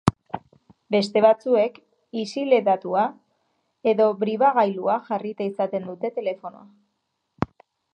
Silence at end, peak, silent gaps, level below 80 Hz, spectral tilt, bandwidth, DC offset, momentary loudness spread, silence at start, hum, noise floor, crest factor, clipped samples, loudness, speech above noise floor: 0.5 s; 0 dBFS; none; -56 dBFS; -6.5 dB/octave; 11 kHz; under 0.1%; 13 LU; 0.05 s; none; -76 dBFS; 24 dB; under 0.1%; -23 LUFS; 54 dB